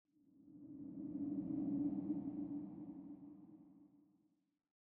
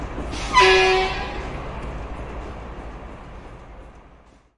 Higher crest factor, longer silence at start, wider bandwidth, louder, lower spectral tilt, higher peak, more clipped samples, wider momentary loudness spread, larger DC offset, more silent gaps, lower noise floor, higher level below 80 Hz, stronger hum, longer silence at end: second, 16 dB vs 22 dB; first, 0.25 s vs 0 s; second, 2 kHz vs 11.5 kHz; second, -45 LUFS vs -19 LUFS; first, -12 dB/octave vs -3.5 dB/octave; second, -30 dBFS vs -2 dBFS; neither; second, 21 LU vs 26 LU; neither; neither; first, -79 dBFS vs -51 dBFS; second, -78 dBFS vs -36 dBFS; neither; first, 0.9 s vs 0.5 s